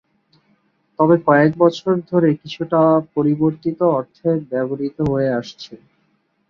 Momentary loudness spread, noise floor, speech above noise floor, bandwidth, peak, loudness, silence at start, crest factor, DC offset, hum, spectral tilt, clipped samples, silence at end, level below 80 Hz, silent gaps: 10 LU; -64 dBFS; 47 dB; 7.2 kHz; -2 dBFS; -18 LUFS; 1 s; 16 dB; under 0.1%; none; -8 dB/octave; under 0.1%; 0.75 s; -54 dBFS; none